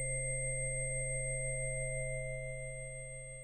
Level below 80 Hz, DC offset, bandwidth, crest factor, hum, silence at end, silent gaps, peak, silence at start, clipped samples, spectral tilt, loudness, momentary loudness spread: -48 dBFS; under 0.1%; 9 kHz; 12 dB; none; 0 s; none; -26 dBFS; 0 s; under 0.1%; -4.5 dB/octave; -38 LUFS; 8 LU